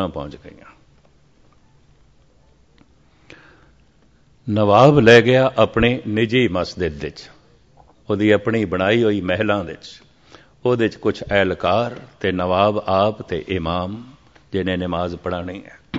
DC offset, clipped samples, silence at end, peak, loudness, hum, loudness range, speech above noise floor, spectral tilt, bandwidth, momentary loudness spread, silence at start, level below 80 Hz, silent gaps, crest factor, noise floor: 0.1%; under 0.1%; 0 s; 0 dBFS; -18 LUFS; none; 6 LU; 37 dB; -6.5 dB/octave; 7.8 kHz; 19 LU; 0 s; -44 dBFS; none; 20 dB; -55 dBFS